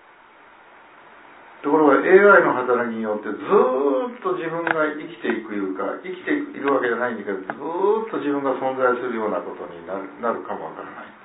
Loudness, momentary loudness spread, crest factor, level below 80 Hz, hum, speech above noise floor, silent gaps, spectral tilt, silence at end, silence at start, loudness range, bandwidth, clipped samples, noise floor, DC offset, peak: -21 LUFS; 16 LU; 20 dB; -76 dBFS; none; 28 dB; none; -10 dB/octave; 0.15 s; 1.5 s; 7 LU; 4 kHz; under 0.1%; -49 dBFS; under 0.1%; -2 dBFS